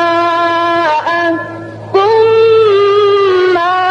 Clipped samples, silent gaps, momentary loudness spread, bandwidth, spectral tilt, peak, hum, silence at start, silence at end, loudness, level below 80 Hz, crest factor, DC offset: under 0.1%; none; 8 LU; 8 kHz; -5.5 dB/octave; -2 dBFS; none; 0 s; 0 s; -10 LUFS; -54 dBFS; 8 dB; under 0.1%